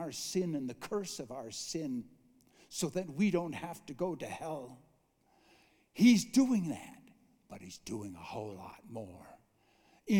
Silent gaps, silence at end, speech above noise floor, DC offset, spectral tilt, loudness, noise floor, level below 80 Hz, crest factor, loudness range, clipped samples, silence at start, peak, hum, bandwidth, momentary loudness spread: none; 0 s; 37 dB; under 0.1%; -5 dB/octave; -35 LUFS; -71 dBFS; -72 dBFS; 22 dB; 7 LU; under 0.1%; 0 s; -14 dBFS; none; 18 kHz; 23 LU